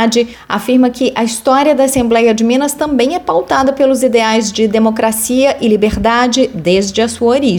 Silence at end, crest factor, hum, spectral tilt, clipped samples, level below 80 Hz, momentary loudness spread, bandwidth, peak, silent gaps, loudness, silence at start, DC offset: 0 s; 10 dB; none; -4 dB/octave; under 0.1%; -36 dBFS; 4 LU; 18 kHz; 0 dBFS; none; -12 LUFS; 0 s; under 0.1%